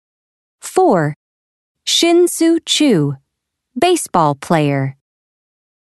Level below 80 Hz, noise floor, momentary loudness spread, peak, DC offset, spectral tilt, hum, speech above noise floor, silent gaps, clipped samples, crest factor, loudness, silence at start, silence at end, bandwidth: -60 dBFS; -76 dBFS; 13 LU; 0 dBFS; under 0.1%; -4.5 dB/octave; none; 62 dB; 1.16-1.75 s; under 0.1%; 16 dB; -15 LUFS; 0.65 s; 1.05 s; 12.5 kHz